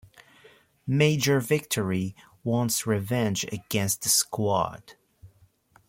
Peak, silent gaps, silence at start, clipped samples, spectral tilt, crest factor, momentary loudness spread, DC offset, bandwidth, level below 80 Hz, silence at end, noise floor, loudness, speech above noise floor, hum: -8 dBFS; none; 0.85 s; under 0.1%; -4 dB/octave; 18 dB; 10 LU; under 0.1%; 16.5 kHz; -62 dBFS; 0.6 s; -60 dBFS; -26 LUFS; 35 dB; none